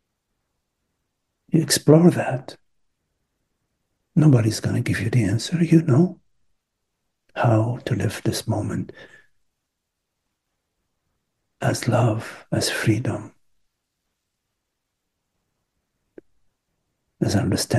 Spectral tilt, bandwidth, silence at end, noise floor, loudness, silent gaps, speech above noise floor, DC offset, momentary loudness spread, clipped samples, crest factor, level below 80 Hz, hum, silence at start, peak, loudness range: -6 dB/octave; 12.5 kHz; 0 s; -79 dBFS; -21 LUFS; none; 60 dB; under 0.1%; 12 LU; under 0.1%; 22 dB; -56 dBFS; none; 1.55 s; 0 dBFS; 11 LU